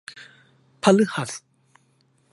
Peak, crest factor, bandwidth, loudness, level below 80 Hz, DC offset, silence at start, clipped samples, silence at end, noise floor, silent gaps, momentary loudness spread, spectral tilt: -2 dBFS; 24 dB; 11.5 kHz; -21 LUFS; -68 dBFS; under 0.1%; 0.15 s; under 0.1%; 0.95 s; -64 dBFS; none; 23 LU; -5 dB/octave